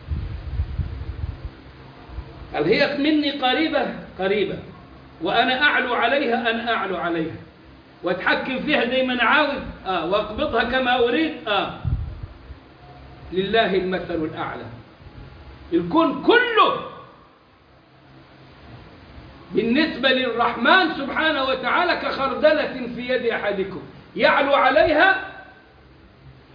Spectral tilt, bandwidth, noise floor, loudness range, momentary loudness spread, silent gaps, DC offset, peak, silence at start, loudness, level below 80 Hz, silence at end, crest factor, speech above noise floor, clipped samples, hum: -7 dB/octave; 5.2 kHz; -52 dBFS; 6 LU; 16 LU; none; under 0.1%; -4 dBFS; 0 s; -21 LUFS; -40 dBFS; 0.25 s; 18 dB; 32 dB; under 0.1%; none